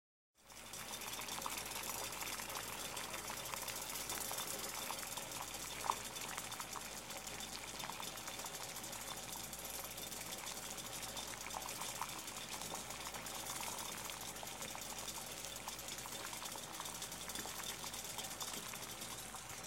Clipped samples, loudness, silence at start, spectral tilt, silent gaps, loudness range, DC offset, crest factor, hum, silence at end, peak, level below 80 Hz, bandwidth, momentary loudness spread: under 0.1%; -44 LUFS; 0.35 s; -1 dB/octave; none; 3 LU; under 0.1%; 26 dB; none; 0 s; -20 dBFS; -66 dBFS; 17 kHz; 4 LU